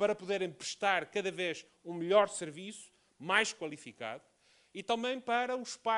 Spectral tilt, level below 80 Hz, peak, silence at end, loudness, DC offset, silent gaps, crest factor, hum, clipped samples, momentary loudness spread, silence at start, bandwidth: -3 dB/octave; -82 dBFS; -14 dBFS; 0 s; -34 LUFS; under 0.1%; none; 22 dB; none; under 0.1%; 17 LU; 0 s; 11.5 kHz